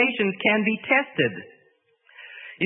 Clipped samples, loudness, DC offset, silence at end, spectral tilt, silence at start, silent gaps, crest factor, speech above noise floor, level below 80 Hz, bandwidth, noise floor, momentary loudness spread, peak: under 0.1%; -22 LUFS; under 0.1%; 0 s; -9.5 dB/octave; 0 s; none; 20 dB; 40 dB; -72 dBFS; 3.9 kHz; -63 dBFS; 20 LU; -6 dBFS